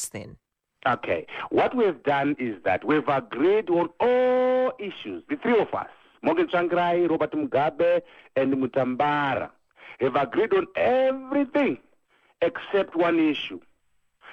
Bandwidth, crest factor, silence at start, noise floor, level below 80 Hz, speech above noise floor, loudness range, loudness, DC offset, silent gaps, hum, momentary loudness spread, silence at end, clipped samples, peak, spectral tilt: 14.5 kHz; 16 dB; 0 s; -68 dBFS; -64 dBFS; 44 dB; 2 LU; -24 LUFS; under 0.1%; none; none; 9 LU; 0 s; under 0.1%; -8 dBFS; -5.5 dB/octave